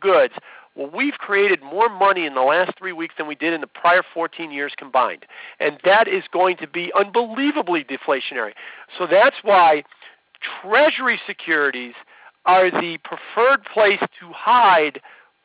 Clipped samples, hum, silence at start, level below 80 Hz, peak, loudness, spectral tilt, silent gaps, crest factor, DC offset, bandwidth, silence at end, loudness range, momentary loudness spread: under 0.1%; none; 0 s; -72 dBFS; -6 dBFS; -18 LUFS; -7 dB/octave; none; 14 dB; under 0.1%; 4 kHz; 0.45 s; 3 LU; 13 LU